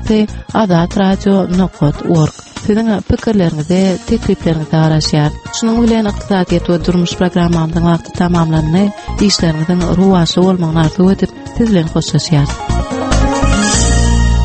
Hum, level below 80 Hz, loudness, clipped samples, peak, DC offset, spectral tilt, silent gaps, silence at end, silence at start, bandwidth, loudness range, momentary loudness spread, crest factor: none; -22 dBFS; -13 LUFS; under 0.1%; 0 dBFS; under 0.1%; -6 dB/octave; none; 0 s; 0 s; 8.8 kHz; 1 LU; 5 LU; 12 dB